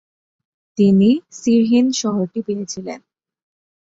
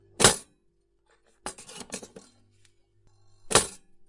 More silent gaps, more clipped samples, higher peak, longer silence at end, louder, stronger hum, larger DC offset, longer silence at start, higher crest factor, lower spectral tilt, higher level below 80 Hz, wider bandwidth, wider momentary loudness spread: neither; neither; about the same, -4 dBFS vs -2 dBFS; first, 1 s vs 0.35 s; first, -17 LUFS vs -23 LUFS; neither; neither; first, 0.75 s vs 0.2 s; second, 14 dB vs 28 dB; first, -6 dB/octave vs -1.5 dB/octave; second, -60 dBFS vs -52 dBFS; second, 7.8 kHz vs 11.5 kHz; second, 17 LU vs 20 LU